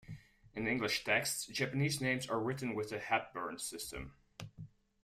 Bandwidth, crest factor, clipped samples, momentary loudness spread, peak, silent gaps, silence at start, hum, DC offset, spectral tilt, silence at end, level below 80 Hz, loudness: 15.5 kHz; 20 dB; under 0.1%; 19 LU; -18 dBFS; none; 0.05 s; none; under 0.1%; -4 dB/octave; 0.35 s; -64 dBFS; -36 LUFS